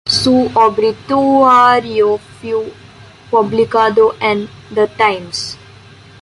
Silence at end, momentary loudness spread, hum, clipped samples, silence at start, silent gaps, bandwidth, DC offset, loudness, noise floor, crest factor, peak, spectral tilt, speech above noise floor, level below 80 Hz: 0.65 s; 13 LU; none; under 0.1%; 0.05 s; none; 11.5 kHz; under 0.1%; -13 LUFS; -39 dBFS; 12 dB; -2 dBFS; -4.5 dB/octave; 27 dB; -48 dBFS